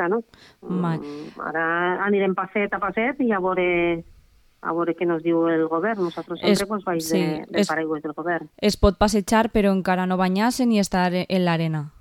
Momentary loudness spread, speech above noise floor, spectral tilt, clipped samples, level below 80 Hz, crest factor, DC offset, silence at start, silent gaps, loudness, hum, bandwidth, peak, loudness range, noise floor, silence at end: 8 LU; 33 dB; -5.5 dB/octave; under 0.1%; -42 dBFS; 18 dB; under 0.1%; 0 s; none; -22 LUFS; none; 17 kHz; -4 dBFS; 3 LU; -55 dBFS; 0.1 s